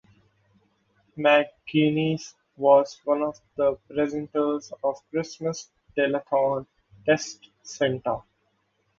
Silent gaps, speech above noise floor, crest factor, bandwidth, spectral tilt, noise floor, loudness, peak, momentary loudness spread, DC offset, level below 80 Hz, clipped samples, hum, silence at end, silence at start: none; 47 dB; 20 dB; 7.6 kHz; -5.5 dB/octave; -71 dBFS; -25 LUFS; -6 dBFS; 13 LU; under 0.1%; -64 dBFS; under 0.1%; none; 0.8 s; 1.15 s